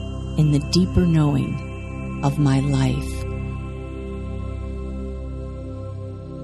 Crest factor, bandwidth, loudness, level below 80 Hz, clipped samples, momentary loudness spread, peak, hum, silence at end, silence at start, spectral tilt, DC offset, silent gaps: 18 dB; 12 kHz; -23 LUFS; -32 dBFS; under 0.1%; 14 LU; -4 dBFS; none; 0 s; 0 s; -7 dB/octave; under 0.1%; none